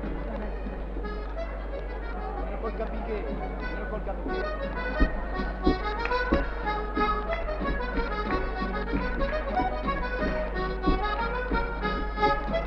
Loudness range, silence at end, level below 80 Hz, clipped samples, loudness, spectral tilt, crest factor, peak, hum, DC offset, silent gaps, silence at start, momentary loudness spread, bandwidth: 5 LU; 0 s; -32 dBFS; under 0.1%; -30 LUFS; -8 dB/octave; 20 dB; -8 dBFS; none; under 0.1%; none; 0 s; 8 LU; 6 kHz